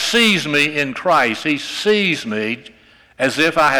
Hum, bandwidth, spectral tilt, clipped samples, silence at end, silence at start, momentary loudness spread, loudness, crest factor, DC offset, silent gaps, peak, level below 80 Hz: none; over 20 kHz; -3.5 dB/octave; under 0.1%; 0 s; 0 s; 8 LU; -16 LUFS; 12 dB; under 0.1%; none; -6 dBFS; -54 dBFS